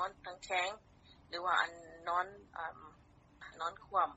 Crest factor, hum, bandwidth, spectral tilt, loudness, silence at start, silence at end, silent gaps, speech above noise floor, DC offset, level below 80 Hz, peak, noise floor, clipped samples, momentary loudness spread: 22 dB; none; 8 kHz; 0.5 dB/octave; -38 LUFS; 0 s; 0 s; none; 19 dB; under 0.1%; -70 dBFS; -18 dBFS; -57 dBFS; under 0.1%; 20 LU